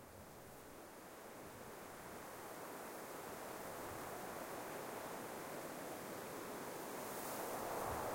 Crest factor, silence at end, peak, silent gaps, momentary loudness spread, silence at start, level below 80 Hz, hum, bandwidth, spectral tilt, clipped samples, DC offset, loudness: 18 dB; 0 s; -32 dBFS; none; 11 LU; 0 s; -72 dBFS; none; 16.5 kHz; -3.5 dB/octave; under 0.1%; under 0.1%; -49 LUFS